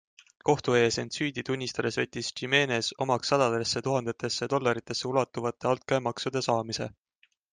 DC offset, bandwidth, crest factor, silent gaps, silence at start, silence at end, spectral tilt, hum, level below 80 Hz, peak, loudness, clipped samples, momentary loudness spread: under 0.1%; 10 kHz; 20 dB; none; 0.45 s; 0.65 s; -4 dB/octave; none; -66 dBFS; -8 dBFS; -28 LUFS; under 0.1%; 7 LU